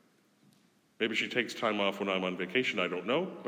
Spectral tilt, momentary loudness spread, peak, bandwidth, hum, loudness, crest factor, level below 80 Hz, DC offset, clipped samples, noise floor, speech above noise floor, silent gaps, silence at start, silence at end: -4.5 dB/octave; 3 LU; -14 dBFS; 16.5 kHz; none; -31 LUFS; 20 dB; -90 dBFS; under 0.1%; under 0.1%; -67 dBFS; 35 dB; none; 1 s; 0 s